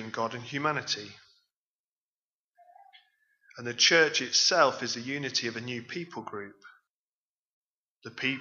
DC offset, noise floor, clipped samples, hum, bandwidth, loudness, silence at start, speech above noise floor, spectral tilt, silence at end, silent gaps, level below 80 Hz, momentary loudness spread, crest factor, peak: under 0.1%; under -90 dBFS; under 0.1%; none; 7.6 kHz; -27 LUFS; 0 s; over 61 dB; -2 dB/octave; 0 s; 1.56-2.52 s, 6.90-7.97 s; -82 dBFS; 20 LU; 24 dB; -8 dBFS